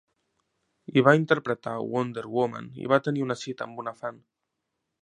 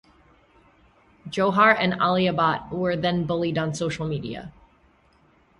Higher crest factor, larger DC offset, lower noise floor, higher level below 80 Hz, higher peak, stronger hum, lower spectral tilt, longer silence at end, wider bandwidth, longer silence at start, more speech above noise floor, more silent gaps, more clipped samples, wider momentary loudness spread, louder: about the same, 24 dB vs 22 dB; neither; first, -82 dBFS vs -60 dBFS; second, -72 dBFS vs -56 dBFS; about the same, -2 dBFS vs -4 dBFS; neither; about the same, -6.5 dB/octave vs -6 dB/octave; second, 0.9 s vs 1.1 s; second, 10 kHz vs 11.5 kHz; second, 0.9 s vs 1.25 s; first, 56 dB vs 37 dB; neither; neither; about the same, 15 LU vs 14 LU; second, -26 LUFS vs -23 LUFS